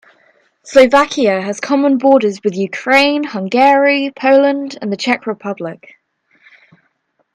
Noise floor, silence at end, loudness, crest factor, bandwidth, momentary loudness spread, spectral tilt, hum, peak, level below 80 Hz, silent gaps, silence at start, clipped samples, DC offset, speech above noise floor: -63 dBFS; 1.6 s; -13 LUFS; 14 dB; 11.5 kHz; 12 LU; -4.5 dB/octave; none; 0 dBFS; -58 dBFS; none; 0.65 s; 0.1%; under 0.1%; 50 dB